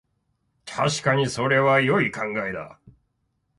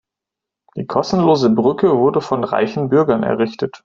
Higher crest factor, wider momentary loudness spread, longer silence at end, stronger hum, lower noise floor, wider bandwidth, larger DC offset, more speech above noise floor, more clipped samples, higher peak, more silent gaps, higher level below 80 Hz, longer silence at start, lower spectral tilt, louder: about the same, 18 dB vs 16 dB; first, 16 LU vs 7 LU; first, 0.9 s vs 0.1 s; neither; second, -73 dBFS vs -84 dBFS; first, 11.5 kHz vs 7.6 kHz; neither; second, 50 dB vs 69 dB; neither; second, -6 dBFS vs 0 dBFS; neither; second, -60 dBFS vs -54 dBFS; about the same, 0.65 s vs 0.75 s; second, -5 dB/octave vs -7 dB/octave; second, -22 LUFS vs -16 LUFS